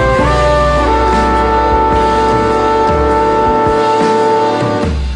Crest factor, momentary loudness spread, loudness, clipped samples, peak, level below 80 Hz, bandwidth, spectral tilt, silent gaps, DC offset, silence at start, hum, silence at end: 10 dB; 1 LU; -11 LUFS; under 0.1%; 0 dBFS; -20 dBFS; 10.5 kHz; -6 dB/octave; none; under 0.1%; 0 s; none; 0 s